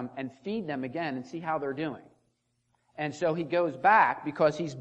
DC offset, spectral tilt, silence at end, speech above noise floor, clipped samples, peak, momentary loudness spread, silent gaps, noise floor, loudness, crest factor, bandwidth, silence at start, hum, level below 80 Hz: under 0.1%; -6 dB/octave; 0 s; 46 dB; under 0.1%; -10 dBFS; 14 LU; none; -75 dBFS; -29 LUFS; 20 dB; 8.8 kHz; 0 s; none; -74 dBFS